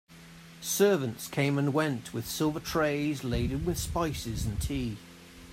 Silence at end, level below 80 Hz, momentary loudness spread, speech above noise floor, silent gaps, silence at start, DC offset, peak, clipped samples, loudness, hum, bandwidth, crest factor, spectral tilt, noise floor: 0 s; -44 dBFS; 14 LU; 21 dB; none; 0.1 s; under 0.1%; -12 dBFS; under 0.1%; -30 LUFS; none; 16 kHz; 20 dB; -5 dB/octave; -50 dBFS